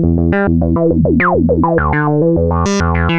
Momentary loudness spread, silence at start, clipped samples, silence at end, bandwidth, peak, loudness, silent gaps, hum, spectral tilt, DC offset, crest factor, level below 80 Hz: 2 LU; 0 s; under 0.1%; 0 s; 7.8 kHz; -2 dBFS; -13 LUFS; none; none; -7.5 dB/octave; under 0.1%; 10 dB; -24 dBFS